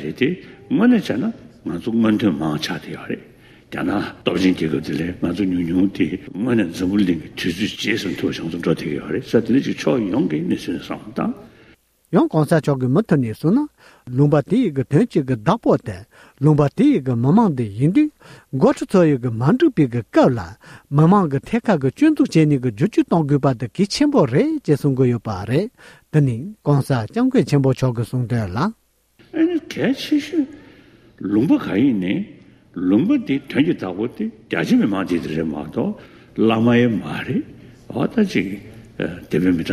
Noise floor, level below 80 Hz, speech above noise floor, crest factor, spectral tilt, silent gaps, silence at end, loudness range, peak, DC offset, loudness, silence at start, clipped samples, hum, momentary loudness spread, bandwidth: -54 dBFS; -50 dBFS; 36 dB; 16 dB; -7.5 dB/octave; none; 0 s; 4 LU; -2 dBFS; under 0.1%; -19 LUFS; 0 s; under 0.1%; none; 11 LU; 14.5 kHz